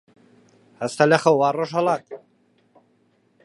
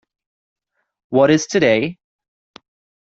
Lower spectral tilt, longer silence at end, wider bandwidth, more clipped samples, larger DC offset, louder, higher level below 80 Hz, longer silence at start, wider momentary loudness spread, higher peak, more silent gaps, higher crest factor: about the same, -5.5 dB/octave vs -5 dB/octave; first, 1.25 s vs 1.1 s; first, 11.5 kHz vs 8 kHz; neither; neither; second, -20 LUFS vs -16 LUFS; second, -74 dBFS vs -60 dBFS; second, 0.8 s vs 1.1 s; first, 19 LU vs 7 LU; about the same, -2 dBFS vs -2 dBFS; neither; about the same, 22 dB vs 18 dB